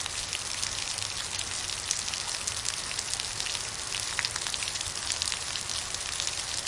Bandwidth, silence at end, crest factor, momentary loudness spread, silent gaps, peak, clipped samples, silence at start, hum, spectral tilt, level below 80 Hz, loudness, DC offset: 11.5 kHz; 0 s; 28 dB; 2 LU; none; -4 dBFS; under 0.1%; 0 s; none; 0.5 dB/octave; -54 dBFS; -30 LUFS; under 0.1%